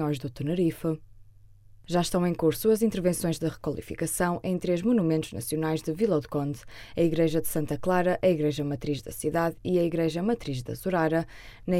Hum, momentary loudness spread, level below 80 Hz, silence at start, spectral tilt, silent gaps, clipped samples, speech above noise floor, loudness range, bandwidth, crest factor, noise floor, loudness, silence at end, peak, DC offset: none; 8 LU; -50 dBFS; 0 s; -6 dB/octave; none; under 0.1%; 25 dB; 1 LU; 16.5 kHz; 16 dB; -52 dBFS; -27 LUFS; 0 s; -12 dBFS; under 0.1%